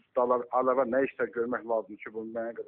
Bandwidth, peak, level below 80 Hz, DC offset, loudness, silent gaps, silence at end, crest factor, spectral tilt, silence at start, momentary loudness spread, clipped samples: 3.7 kHz; -12 dBFS; -74 dBFS; under 0.1%; -29 LUFS; none; 0.05 s; 18 dB; -5.5 dB/octave; 0.15 s; 11 LU; under 0.1%